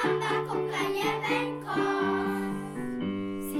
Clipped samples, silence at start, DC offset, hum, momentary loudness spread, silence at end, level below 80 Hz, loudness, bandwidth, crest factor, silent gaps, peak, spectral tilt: under 0.1%; 0 s; under 0.1%; none; 6 LU; 0 s; -64 dBFS; -30 LUFS; 17 kHz; 14 dB; none; -16 dBFS; -5.5 dB/octave